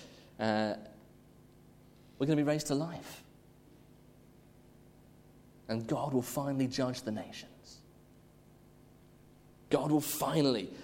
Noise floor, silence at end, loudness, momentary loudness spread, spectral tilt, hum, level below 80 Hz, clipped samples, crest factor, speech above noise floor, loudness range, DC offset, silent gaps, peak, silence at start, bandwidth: -60 dBFS; 0 s; -34 LUFS; 23 LU; -5.5 dB/octave; none; -66 dBFS; under 0.1%; 22 dB; 27 dB; 5 LU; under 0.1%; none; -14 dBFS; 0 s; 16.5 kHz